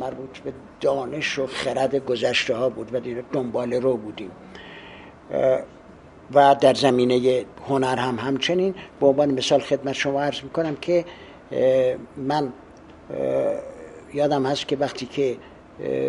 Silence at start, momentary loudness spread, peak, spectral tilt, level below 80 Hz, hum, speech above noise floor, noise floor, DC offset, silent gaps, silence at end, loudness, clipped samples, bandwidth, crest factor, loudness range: 0 s; 17 LU; -4 dBFS; -5 dB/octave; -56 dBFS; none; 24 dB; -46 dBFS; under 0.1%; none; 0 s; -23 LUFS; under 0.1%; 11.5 kHz; 20 dB; 6 LU